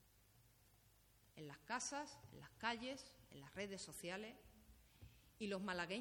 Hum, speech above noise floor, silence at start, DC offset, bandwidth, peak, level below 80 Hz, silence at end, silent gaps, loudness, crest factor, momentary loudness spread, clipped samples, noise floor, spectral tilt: none; 24 dB; 0 s; under 0.1%; over 20 kHz; -28 dBFS; -74 dBFS; 0 s; none; -49 LUFS; 24 dB; 21 LU; under 0.1%; -73 dBFS; -3 dB/octave